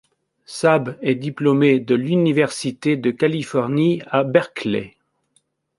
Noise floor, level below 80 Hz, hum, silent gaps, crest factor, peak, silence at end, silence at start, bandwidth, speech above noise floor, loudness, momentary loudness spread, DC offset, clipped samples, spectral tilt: -65 dBFS; -62 dBFS; none; none; 18 dB; -2 dBFS; 0.9 s; 0.5 s; 11.5 kHz; 46 dB; -19 LUFS; 8 LU; under 0.1%; under 0.1%; -6.5 dB/octave